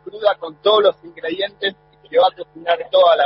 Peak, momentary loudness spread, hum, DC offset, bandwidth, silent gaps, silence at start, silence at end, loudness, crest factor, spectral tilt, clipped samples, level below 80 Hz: -2 dBFS; 11 LU; none; under 0.1%; 5.8 kHz; none; 0.05 s; 0 s; -18 LUFS; 16 dB; -7.5 dB/octave; under 0.1%; -64 dBFS